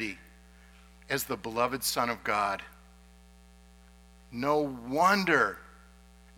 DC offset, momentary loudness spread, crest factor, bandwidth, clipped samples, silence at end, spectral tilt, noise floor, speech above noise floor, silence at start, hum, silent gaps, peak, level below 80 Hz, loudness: under 0.1%; 16 LU; 22 dB; 19 kHz; under 0.1%; 0.7 s; -3.5 dB/octave; -56 dBFS; 27 dB; 0 s; 60 Hz at -55 dBFS; none; -10 dBFS; -58 dBFS; -29 LUFS